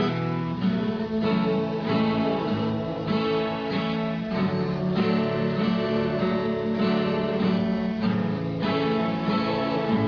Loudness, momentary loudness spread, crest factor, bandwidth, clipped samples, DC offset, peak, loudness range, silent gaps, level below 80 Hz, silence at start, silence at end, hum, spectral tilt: -25 LUFS; 3 LU; 12 dB; 5.4 kHz; under 0.1%; under 0.1%; -12 dBFS; 1 LU; none; -52 dBFS; 0 s; 0 s; none; -8.5 dB/octave